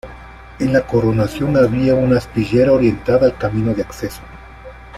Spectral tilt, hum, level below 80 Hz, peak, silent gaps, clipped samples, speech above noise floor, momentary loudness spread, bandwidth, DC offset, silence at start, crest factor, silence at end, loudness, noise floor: -8 dB/octave; none; -36 dBFS; -2 dBFS; none; under 0.1%; 21 dB; 12 LU; 14 kHz; under 0.1%; 0.05 s; 14 dB; 0 s; -16 LUFS; -37 dBFS